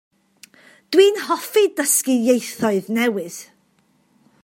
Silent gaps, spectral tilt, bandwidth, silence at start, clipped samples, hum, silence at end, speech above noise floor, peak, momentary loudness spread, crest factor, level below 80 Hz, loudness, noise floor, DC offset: none; -3 dB/octave; 16.5 kHz; 0.9 s; under 0.1%; none; 1 s; 43 dB; -2 dBFS; 10 LU; 18 dB; -74 dBFS; -18 LUFS; -61 dBFS; under 0.1%